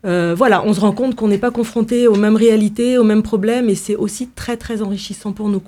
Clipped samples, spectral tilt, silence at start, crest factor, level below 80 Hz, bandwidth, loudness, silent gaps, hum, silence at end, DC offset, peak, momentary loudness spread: under 0.1%; -6 dB/octave; 0.05 s; 14 dB; -44 dBFS; 14.5 kHz; -16 LUFS; none; none; 0.05 s; under 0.1%; 0 dBFS; 11 LU